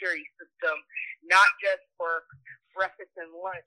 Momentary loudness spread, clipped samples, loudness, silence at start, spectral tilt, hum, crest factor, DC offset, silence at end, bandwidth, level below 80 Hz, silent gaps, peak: 19 LU; under 0.1%; -26 LUFS; 0 s; -1 dB/octave; none; 24 dB; under 0.1%; 0.05 s; 12.5 kHz; -82 dBFS; none; -6 dBFS